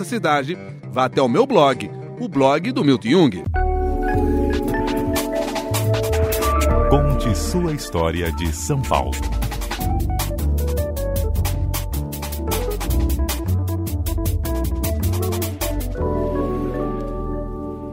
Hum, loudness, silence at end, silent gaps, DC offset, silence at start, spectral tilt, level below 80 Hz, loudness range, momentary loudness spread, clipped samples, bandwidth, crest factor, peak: none; -21 LUFS; 0 s; none; under 0.1%; 0 s; -6 dB/octave; -26 dBFS; 5 LU; 9 LU; under 0.1%; 16.5 kHz; 18 dB; 0 dBFS